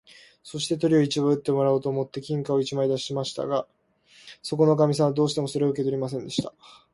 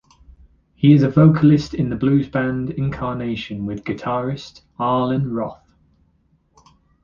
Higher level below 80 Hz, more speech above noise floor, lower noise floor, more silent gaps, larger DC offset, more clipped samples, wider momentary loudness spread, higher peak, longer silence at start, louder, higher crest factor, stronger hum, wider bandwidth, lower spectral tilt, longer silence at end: second, -64 dBFS vs -46 dBFS; second, 33 dB vs 43 dB; second, -57 dBFS vs -61 dBFS; neither; neither; neither; second, 10 LU vs 14 LU; second, -8 dBFS vs -2 dBFS; second, 0.45 s vs 0.8 s; second, -25 LUFS vs -19 LUFS; about the same, 18 dB vs 18 dB; neither; first, 11.5 kHz vs 7.2 kHz; second, -6 dB/octave vs -8.5 dB/octave; second, 0.25 s vs 1.5 s